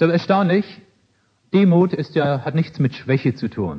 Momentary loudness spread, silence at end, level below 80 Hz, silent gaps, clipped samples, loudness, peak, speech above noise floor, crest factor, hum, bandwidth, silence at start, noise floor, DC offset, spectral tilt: 7 LU; 0 s; -58 dBFS; none; under 0.1%; -19 LUFS; -2 dBFS; 44 dB; 16 dB; none; 6.2 kHz; 0 s; -62 dBFS; under 0.1%; -9 dB/octave